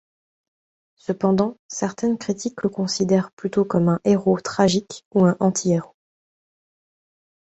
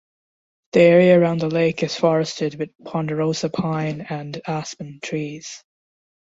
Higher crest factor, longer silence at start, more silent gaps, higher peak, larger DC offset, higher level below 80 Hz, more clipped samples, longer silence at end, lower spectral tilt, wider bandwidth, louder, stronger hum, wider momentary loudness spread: about the same, 20 dB vs 18 dB; first, 1.1 s vs 0.75 s; first, 1.59-1.69 s, 3.33-3.37 s, 5.05-5.11 s vs 2.75-2.79 s; about the same, -4 dBFS vs -2 dBFS; neither; about the same, -60 dBFS vs -60 dBFS; neither; first, 1.7 s vs 0.8 s; about the same, -6 dB/octave vs -6 dB/octave; about the same, 8.2 kHz vs 7.8 kHz; about the same, -21 LUFS vs -20 LUFS; neither; second, 7 LU vs 17 LU